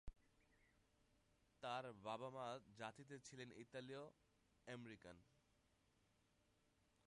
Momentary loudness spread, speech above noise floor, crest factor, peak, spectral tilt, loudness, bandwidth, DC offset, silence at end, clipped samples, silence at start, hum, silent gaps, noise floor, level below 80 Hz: 13 LU; 26 dB; 22 dB; -36 dBFS; -4.5 dB/octave; -55 LUFS; 11 kHz; under 0.1%; 1.85 s; under 0.1%; 0.05 s; none; none; -82 dBFS; -76 dBFS